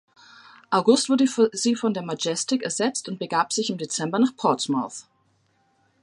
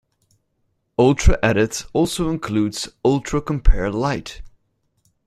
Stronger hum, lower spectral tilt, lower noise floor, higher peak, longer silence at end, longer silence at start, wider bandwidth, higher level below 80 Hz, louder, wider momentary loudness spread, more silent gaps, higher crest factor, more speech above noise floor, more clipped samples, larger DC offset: neither; second, -3.5 dB/octave vs -5.5 dB/octave; about the same, -66 dBFS vs -69 dBFS; second, -6 dBFS vs -2 dBFS; first, 1 s vs 0.8 s; second, 0.7 s vs 1 s; second, 11.5 kHz vs 13.5 kHz; second, -74 dBFS vs -24 dBFS; second, -23 LUFS vs -20 LUFS; about the same, 8 LU vs 7 LU; neither; about the same, 20 dB vs 18 dB; second, 43 dB vs 52 dB; neither; neither